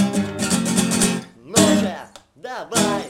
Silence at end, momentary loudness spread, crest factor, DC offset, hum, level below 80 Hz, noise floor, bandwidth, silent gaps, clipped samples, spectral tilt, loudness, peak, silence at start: 0 s; 17 LU; 16 dB; under 0.1%; none; -50 dBFS; -39 dBFS; 17 kHz; none; under 0.1%; -4 dB/octave; -19 LUFS; -4 dBFS; 0 s